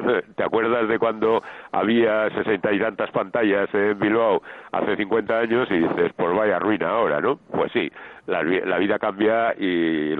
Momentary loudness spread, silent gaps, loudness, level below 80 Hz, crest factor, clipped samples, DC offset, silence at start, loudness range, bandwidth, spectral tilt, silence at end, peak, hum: 5 LU; none; -22 LUFS; -62 dBFS; 14 dB; under 0.1%; under 0.1%; 0 s; 1 LU; 4.3 kHz; -8.5 dB/octave; 0 s; -8 dBFS; none